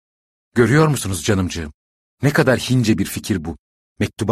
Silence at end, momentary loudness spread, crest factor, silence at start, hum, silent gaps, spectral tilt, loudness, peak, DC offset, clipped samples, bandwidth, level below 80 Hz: 0 s; 13 LU; 18 dB; 0.55 s; none; 1.74-2.17 s, 3.59-3.96 s; -5.5 dB/octave; -18 LUFS; -2 dBFS; under 0.1%; under 0.1%; 15.5 kHz; -42 dBFS